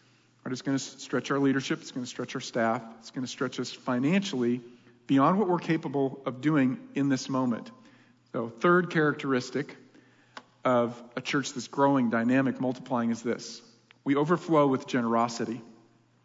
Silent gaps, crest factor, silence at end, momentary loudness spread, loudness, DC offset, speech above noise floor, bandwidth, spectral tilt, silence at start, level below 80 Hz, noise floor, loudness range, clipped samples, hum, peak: none; 18 dB; 0.55 s; 12 LU; -28 LUFS; under 0.1%; 33 dB; 7.8 kHz; -6 dB/octave; 0.45 s; -78 dBFS; -61 dBFS; 3 LU; under 0.1%; none; -10 dBFS